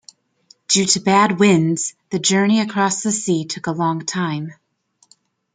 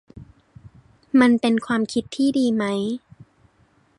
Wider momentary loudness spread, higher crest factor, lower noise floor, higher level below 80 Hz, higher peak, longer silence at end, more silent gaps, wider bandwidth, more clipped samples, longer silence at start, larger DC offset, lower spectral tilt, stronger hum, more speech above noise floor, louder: about the same, 10 LU vs 9 LU; about the same, 18 dB vs 18 dB; about the same, -61 dBFS vs -60 dBFS; about the same, -62 dBFS vs -58 dBFS; first, 0 dBFS vs -4 dBFS; about the same, 1 s vs 1 s; neither; second, 9.6 kHz vs 11 kHz; neither; first, 0.7 s vs 0.15 s; neither; second, -4 dB/octave vs -5.5 dB/octave; neither; first, 44 dB vs 40 dB; first, -18 LUFS vs -21 LUFS